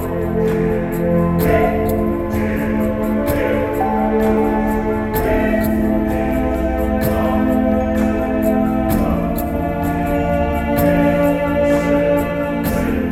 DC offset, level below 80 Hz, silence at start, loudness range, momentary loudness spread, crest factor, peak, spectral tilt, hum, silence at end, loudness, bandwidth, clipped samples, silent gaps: 0.5%; -28 dBFS; 0 s; 1 LU; 4 LU; 14 dB; -4 dBFS; -7.5 dB/octave; none; 0 s; -17 LUFS; 17 kHz; under 0.1%; none